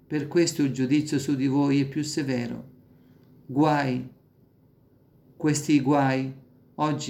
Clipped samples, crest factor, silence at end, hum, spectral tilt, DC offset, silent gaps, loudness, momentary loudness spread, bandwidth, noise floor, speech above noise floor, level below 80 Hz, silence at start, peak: under 0.1%; 16 dB; 0 s; none; -5.5 dB/octave; under 0.1%; none; -25 LUFS; 11 LU; 15.5 kHz; -59 dBFS; 35 dB; -66 dBFS; 0.1 s; -10 dBFS